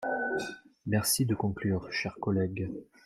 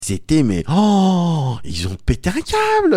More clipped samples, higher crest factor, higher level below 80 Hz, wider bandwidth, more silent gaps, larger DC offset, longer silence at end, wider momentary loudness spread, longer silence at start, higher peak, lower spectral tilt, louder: neither; about the same, 18 dB vs 14 dB; second, -60 dBFS vs -32 dBFS; first, 16 kHz vs 14.5 kHz; neither; neither; first, 0.25 s vs 0 s; about the same, 11 LU vs 9 LU; about the same, 0 s vs 0 s; second, -14 dBFS vs -2 dBFS; second, -4.5 dB/octave vs -6 dB/octave; second, -31 LUFS vs -17 LUFS